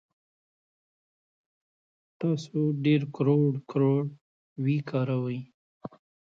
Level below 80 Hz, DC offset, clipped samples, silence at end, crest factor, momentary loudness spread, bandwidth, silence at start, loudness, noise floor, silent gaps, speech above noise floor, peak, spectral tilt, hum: -74 dBFS; under 0.1%; under 0.1%; 0.45 s; 18 dB; 21 LU; 7.4 kHz; 2.2 s; -28 LUFS; under -90 dBFS; 4.21-4.56 s, 5.54-5.80 s; over 64 dB; -12 dBFS; -9 dB/octave; none